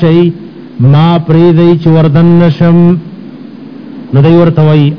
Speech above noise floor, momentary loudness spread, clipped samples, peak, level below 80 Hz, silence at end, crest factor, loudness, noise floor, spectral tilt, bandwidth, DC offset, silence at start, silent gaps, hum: 21 dB; 21 LU; 10%; 0 dBFS; -38 dBFS; 0 s; 6 dB; -6 LUFS; -26 dBFS; -10.5 dB/octave; 5.4 kHz; under 0.1%; 0 s; none; none